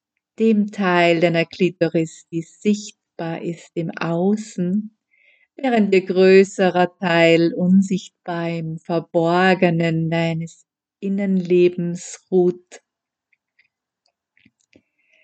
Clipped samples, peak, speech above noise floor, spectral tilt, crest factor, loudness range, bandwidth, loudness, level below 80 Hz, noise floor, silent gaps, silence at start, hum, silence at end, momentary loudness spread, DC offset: under 0.1%; 0 dBFS; 54 dB; -6.5 dB/octave; 20 dB; 8 LU; 8.8 kHz; -19 LUFS; -74 dBFS; -72 dBFS; none; 0.4 s; none; 2.45 s; 14 LU; under 0.1%